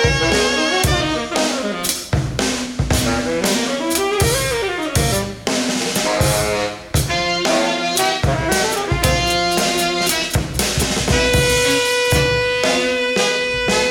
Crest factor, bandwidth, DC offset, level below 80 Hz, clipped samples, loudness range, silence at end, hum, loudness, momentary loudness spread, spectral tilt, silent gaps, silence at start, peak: 16 dB; 18 kHz; under 0.1%; -30 dBFS; under 0.1%; 3 LU; 0 s; none; -17 LUFS; 5 LU; -3.5 dB/octave; none; 0 s; -2 dBFS